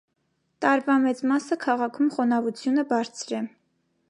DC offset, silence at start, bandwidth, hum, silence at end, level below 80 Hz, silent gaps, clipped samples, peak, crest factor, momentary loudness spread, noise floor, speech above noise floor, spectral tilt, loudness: under 0.1%; 0.6 s; 11 kHz; none; 0.6 s; -80 dBFS; none; under 0.1%; -6 dBFS; 18 dB; 9 LU; -71 dBFS; 47 dB; -4.5 dB/octave; -25 LUFS